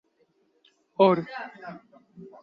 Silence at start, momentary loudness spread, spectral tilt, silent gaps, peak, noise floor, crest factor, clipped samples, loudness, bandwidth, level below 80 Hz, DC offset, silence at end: 1 s; 22 LU; -8.5 dB/octave; none; -8 dBFS; -68 dBFS; 22 dB; under 0.1%; -24 LUFS; 5.6 kHz; -74 dBFS; under 0.1%; 0.15 s